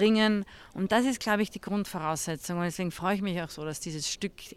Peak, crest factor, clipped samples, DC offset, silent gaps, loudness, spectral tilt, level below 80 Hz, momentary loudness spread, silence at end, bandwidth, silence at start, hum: -12 dBFS; 18 dB; under 0.1%; under 0.1%; none; -30 LUFS; -4.5 dB/octave; -58 dBFS; 9 LU; 0 s; 16 kHz; 0 s; none